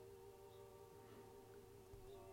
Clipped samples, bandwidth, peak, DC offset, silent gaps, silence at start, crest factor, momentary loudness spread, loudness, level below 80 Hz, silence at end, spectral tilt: under 0.1%; 16 kHz; -48 dBFS; under 0.1%; none; 0 s; 14 dB; 2 LU; -62 LUFS; -72 dBFS; 0 s; -5.5 dB/octave